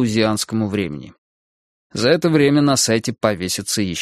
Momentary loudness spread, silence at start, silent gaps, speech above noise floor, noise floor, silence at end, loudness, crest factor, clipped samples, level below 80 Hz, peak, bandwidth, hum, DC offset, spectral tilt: 9 LU; 0 s; 1.18-1.90 s; over 72 dB; under -90 dBFS; 0 s; -18 LUFS; 18 dB; under 0.1%; -52 dBFS; 0 dBFS; 15.5 kHz; none; under 0.1%; -4.5 dB/octave